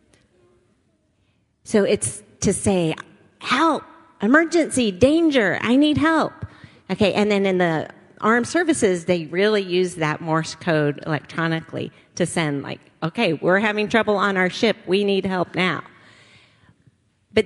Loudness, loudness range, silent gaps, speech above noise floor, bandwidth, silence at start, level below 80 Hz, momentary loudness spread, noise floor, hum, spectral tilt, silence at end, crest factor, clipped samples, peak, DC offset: -20 LUFS; 5 LU; none; 45 dB; 11.5 kHz; 1.65 s; -54 dBFS; 11 LU; -65 dBFS; none; -5 dB/octave; 0 s; 20 dB; under 0.1%; -2 dBFS; under 0.1%